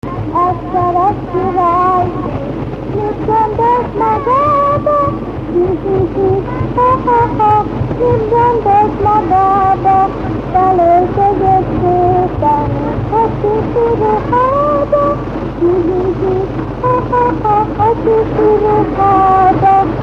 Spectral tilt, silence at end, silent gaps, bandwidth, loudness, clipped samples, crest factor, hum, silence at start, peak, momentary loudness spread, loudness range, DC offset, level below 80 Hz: -9.5 dB/octave; 0 s; none; 7.6 kHz; -12 LUFS; under 0.1%; 12 dB; none; 0.05 s; 0 dBFS; 7 LU; 3 LU; under 0.1%; -30 dBFS